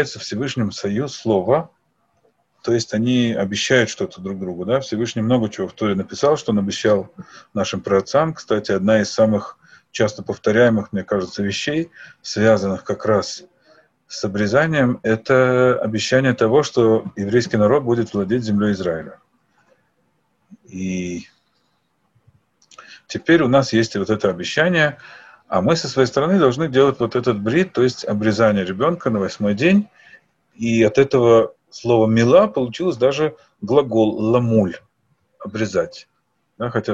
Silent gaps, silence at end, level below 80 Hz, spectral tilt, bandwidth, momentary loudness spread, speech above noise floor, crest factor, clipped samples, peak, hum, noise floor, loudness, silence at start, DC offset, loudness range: none; 0 s; -54 dBFS; -6 dB/octave; 8.2 kHz; 11 LU; 49 dB; 18 dB; under 0.1%; -2 dBFS; none; -66 dBFS; -18 LUFS; 0 s; under 0.1%; 5 LU